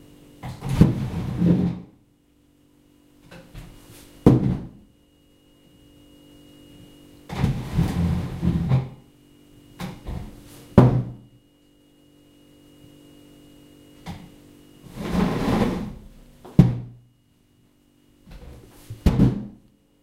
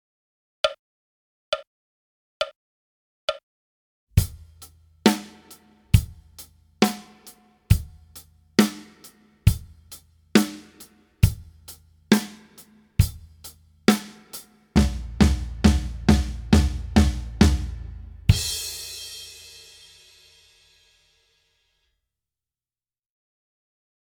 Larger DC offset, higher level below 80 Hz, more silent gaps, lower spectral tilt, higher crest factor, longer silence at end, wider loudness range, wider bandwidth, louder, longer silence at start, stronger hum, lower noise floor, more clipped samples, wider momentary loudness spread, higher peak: neither; second, -38 dBFS vs -32 dBFS; second, none vs 0.79-1.52 s, 1.67-2.40 s, 2.55-3.28 s, 3.43-4.07 s; first, -8.5 dB/octave vs -5.5 dB/octave; about the same, 26 dB vs 24 dB; second, 0.5 s vs 4.8 s; second, 7 LU vs 10 LU; second, 15 kHz vs over 20 kHz; about the same, -22 LUFS vs -24 LUFS; second, 0.45 s vs 0.65 s; neither; second, -60 dBFS vs under -90 dBFS; neither; first, 26 LU vs 23 LU; about the same, 0 dBFS vs 0 dBFS